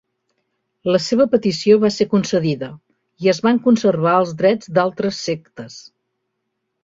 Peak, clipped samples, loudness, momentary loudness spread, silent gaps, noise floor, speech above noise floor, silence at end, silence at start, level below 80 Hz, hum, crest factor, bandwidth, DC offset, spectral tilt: -2 dBFS; under 0.1%; -17 LUFS; 12 LU; none; -75 dBFS; 58 dB; 1 s; 0.85 s; -58 dBFS; none; 16 dB; 7.8 kHz; under 0.1%; -6 dB/octave